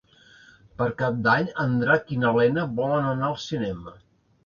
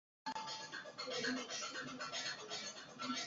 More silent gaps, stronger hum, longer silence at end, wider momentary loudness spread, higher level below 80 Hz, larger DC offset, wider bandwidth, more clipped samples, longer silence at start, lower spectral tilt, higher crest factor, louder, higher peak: neither; neither; first, 0.55 s vs 0 s; about the same, 8 LU vs 7 LU; first, -56 dBFS vs -84 dBFS; neither; about the same, 7.2 kHz vs 7.6 kHz; neither; first, 0.8 s vs 0.25 s; first, -7 dB/octave vs -0.5 dB/octave; about the same, 18 dB vs 18 dB; first, -24 LUFS vs -44 LUFS; first, -6 dBFS vs -28 dBFS